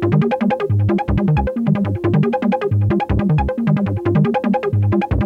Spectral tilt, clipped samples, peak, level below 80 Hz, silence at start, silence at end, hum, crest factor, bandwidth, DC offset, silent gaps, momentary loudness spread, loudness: -10 dB/octave; under 0.1%; -4 dBFS; -30 dBFS; 0 s; 0 s; none; 12 dB; 5.4 kHz; under 0.1%; none; 2 LU; -17 LUFS